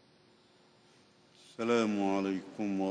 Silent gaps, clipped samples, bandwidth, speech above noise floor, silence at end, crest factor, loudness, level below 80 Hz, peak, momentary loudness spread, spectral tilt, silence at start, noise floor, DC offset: none; under 0.1%; 10 kHz; 33 dB; 0 s; 20 dB; -33 LUFS; -78 dBFS; -16 dBFS; 8 LU; -6 dB/octave; 1.6 s; -64 dBFS; under 0.1%